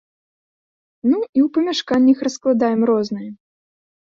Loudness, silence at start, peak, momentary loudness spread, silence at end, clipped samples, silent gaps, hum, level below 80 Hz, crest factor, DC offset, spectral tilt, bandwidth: -18 LUFS; 1.05 s; -4 dBFS; 9 LU; 0.7 s; under 0.1%; 1.29-1.33 s; none; -62 dBFS; 16 dB; under 0.1%; -5.5 dB/octave; 7.6 kHz